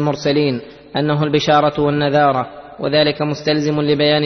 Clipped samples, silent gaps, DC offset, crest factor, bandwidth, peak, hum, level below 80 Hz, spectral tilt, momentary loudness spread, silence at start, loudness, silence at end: under 0.1%; none; under 0.1%; 14 dB; 6.4 kHz; -2 dBFS; none; -50 dBFS; -6 dB/octave; 9 LU; 0 s; -16 LUFS; 0 s